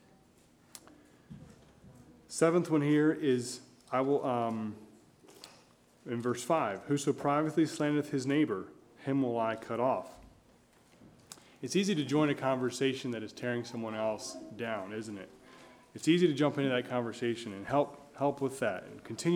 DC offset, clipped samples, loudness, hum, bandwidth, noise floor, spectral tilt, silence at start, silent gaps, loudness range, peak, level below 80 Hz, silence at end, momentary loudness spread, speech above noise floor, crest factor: under 0.1%; under 0.1%; -32 LUFS; none; 15.5 kHz; -63 dBFS; -5.5 dB/octave; 0.75 s; none; 4 LU; -14 dBFS; -72 dBFS; 0 s; 23 LU; 32 dB; 20 dB